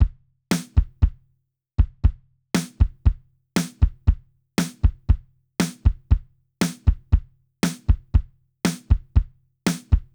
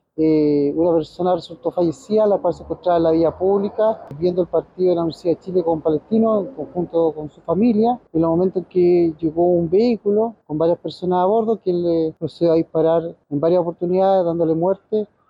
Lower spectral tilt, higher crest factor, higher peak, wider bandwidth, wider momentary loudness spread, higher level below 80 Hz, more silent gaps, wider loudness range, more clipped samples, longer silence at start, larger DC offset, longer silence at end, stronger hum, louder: second, -6 dB/octave vs -9 dB/octave; first, 18 dB vs 10 dB; first, -4 dBFS vs -8 dBFS; first, over 20 kHz vs 7.8 kHz; about the same, 5 LU vs 6 LU; first, -24 dBFS vs -54 dBFS; neither; about the same, 0 LU vs 2 LU; neither; second, 0 s vs 0.2 s; neither; about the same, 0.15 s vs 0.25 s; neither; second, -24 LUFS vs -19 LUFS